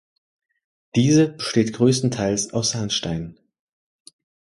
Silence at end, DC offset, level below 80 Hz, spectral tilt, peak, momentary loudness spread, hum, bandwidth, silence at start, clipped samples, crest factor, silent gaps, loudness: 1.15 s; under 0.1%; -52 dBFS; -5 dB/octave; -4 dBFS; 9 LU; none; 11.5 kHz; 0.95 s; under 0.1%; 18 dB; none; -21 LUFS